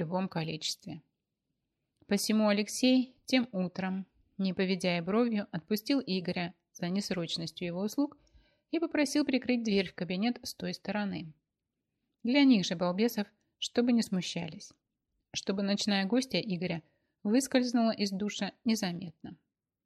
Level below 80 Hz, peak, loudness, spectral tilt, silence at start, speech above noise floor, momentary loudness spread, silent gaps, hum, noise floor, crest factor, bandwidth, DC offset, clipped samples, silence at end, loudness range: -72 dBFS; -14 dBFS; -31 LUFS; -5 dB/octave; 0 s; 56 dB; 12 LU; none; none; -87 dBFS; 20 dB; 13.5 kHz; under 0.1%; under 0.1%; 0.5 s; 3 LU